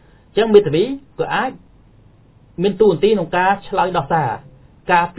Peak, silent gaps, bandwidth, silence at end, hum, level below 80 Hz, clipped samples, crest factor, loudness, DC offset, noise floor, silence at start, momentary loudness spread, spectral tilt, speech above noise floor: 0 dBFS; none; 4 kHz; 0.05 s; none; -48 dBFS; under 0.1%; 18 dB; -17 LUFS; under 0.1%; -48 dBFS; 0.35 s; 12 LU; -10.5 dB/octave; 32 dB